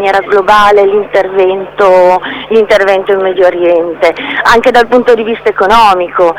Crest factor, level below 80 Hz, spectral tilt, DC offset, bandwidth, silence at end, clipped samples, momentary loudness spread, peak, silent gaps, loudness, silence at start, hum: 8 dB; -36 dBFS; -4.5 dB/octave; under 0.1%; 18 kHz; 0 s; 3%; 6 LU; 0 dBFS; none; -8 LUFS; 0 s; none